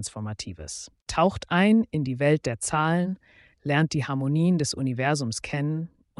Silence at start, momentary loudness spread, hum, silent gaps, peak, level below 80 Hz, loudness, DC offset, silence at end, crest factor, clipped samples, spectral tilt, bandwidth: 0 s; 13 LU; none; 1.02-1.06 s; -10 dBFS; -52 dBFS; -25 LUFS; under 0.1%; 0.3 s; 16 dB; under 0.1%; -5.5 dB/octave; 11.5 kHz